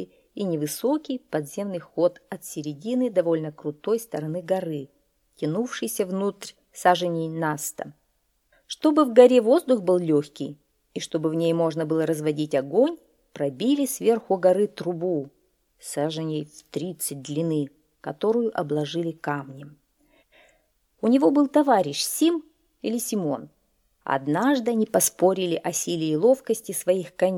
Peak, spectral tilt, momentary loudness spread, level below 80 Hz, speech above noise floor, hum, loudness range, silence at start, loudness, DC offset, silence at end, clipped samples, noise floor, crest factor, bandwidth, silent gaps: -2 dBFS; -5 dB/octave; 14 LU; -72 dBFS; 47 dB; none; 7 LU; 0 s; -24 LUFS; under 0.1%; 0 s; under 0.1%; -70 dBFS; 22 dB; 18.5 kHz; none